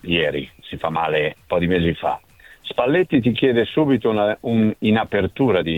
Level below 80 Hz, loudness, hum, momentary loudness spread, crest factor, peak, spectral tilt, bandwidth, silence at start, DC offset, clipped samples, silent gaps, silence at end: -46 dBFS; -20 LUFS; none; 9 LU; 14 dB; -4 dBFS; -8 dB/octave; 15.5 kHz; 0.05 s; under 0.1%; under 0.1%; none; 0 s